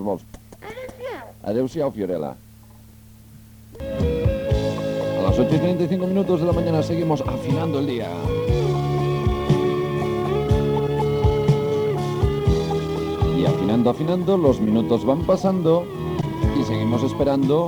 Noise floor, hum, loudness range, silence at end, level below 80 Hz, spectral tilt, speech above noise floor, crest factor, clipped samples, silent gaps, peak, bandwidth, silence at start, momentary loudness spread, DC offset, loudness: -46 dBFS; none; 7 LU; 0 s; -34 dBFS; -8 dB/octave; 26 dB; 16 dB; under 0.1%; none; -4 dBFS; over 20 kHz; 0 s; 8 LU; under 0.1%; -21 LUFS